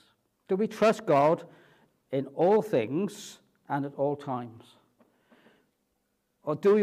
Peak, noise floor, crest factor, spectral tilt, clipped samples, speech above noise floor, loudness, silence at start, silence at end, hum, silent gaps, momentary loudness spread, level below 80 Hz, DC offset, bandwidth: -12 dBFS; -76 dBFS; 18 dB; -6.5 dB/octave; under 0.1%; 50 dB; -28 LUFS; 0.5 s; 0 s; none; none; 13 LU; -78 dBFS; under 0.1%; 14.5 kHz